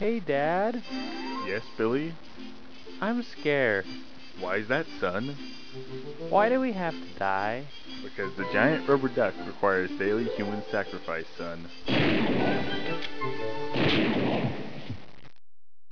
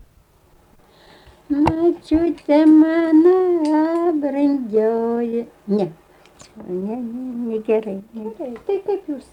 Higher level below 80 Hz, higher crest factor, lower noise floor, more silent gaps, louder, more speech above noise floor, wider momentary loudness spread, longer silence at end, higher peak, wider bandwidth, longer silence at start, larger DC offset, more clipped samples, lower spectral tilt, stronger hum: second, -60 dBFS vs -48 dBFS; first, 22 dB vs 14 dB; first, under -90 dBFS vs -54 dBFS; neither; second, -29 LUFS vs -18 LUFS; first, over 61 dB vs 36 dB; about the same, 16 LU vs 16 LU; first, 0.65 s vs 0.1 s; second, -8 dBFS vs -4 dBFS; second, 5.4 kHz vs 9.2 kHz; second, 0 s vs 1.5 s; first, 1% vs under 0.1%; neither; second, -6.5 dB/octave vs -8 dB/octave; neither